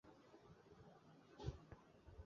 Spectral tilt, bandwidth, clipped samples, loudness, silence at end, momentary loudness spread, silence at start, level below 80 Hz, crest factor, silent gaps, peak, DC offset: -6.5 dB/octave; 7.2 kHz; under 0.1%; -60 LUFS; 0 s; 13 LU; 0.05 s; -66 dBFS; 26 dB; none; -34 dBFS; under 0.1%